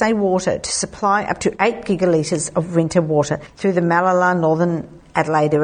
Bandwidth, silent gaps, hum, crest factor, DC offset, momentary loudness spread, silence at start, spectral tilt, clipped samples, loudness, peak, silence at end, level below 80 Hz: 9.8 kHz; none; none; 16 dB; under 0.1%; 6 LU; 0 s; -5 dB/octave; under 0.1%; -18 LUFS; 0 dBFS; 0 s; -48 dBFS